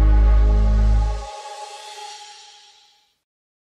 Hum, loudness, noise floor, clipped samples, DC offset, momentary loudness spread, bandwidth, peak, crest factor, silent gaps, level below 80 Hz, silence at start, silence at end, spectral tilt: none; -19 LUFS; -57 dBFS; under 0.1%; under 0.1%; 20 LU; 8.4 kHz; -8 dBFS; 12 dB; none; -20 dBFS; 0 s; 1.45 s; -6.5 dB/octave